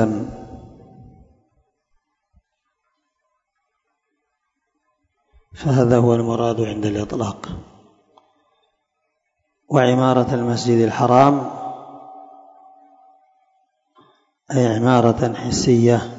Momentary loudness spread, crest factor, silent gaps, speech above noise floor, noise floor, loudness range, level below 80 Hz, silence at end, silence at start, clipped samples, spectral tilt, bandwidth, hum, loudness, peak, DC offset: 20 LU; 20 dB; none; 58 dB; -75 dBFS; 10 LU; -50 dBFS; 0 s; 0 s; under 0.1%; -6.5 dB/octave; 8 kHz; none; -18 LUFS; 0 dBFS; under 0.1%